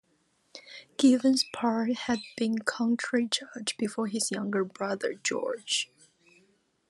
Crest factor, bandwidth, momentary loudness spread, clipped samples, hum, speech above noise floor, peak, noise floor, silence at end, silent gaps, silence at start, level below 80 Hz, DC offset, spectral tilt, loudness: 20 dB; 12.5 kHz; 10 LU; under 0.1%; none; 42 dB; -10 dBFS; -70 dBFS; 1.05 s; none; 0.55 s; -74 dBFS; under 0.1%; -3 dB/octave; -29 LUFS